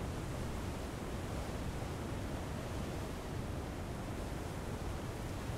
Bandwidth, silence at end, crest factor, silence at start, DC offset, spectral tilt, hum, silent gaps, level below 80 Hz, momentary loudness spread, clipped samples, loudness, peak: 16 kHz; 0 s; 12 dB; 0 s; under 0.1%; -6 dB/octave; none; none; -48 dBFS; 1 LU; under 0.1%; -42 LUFS; -28 dBFS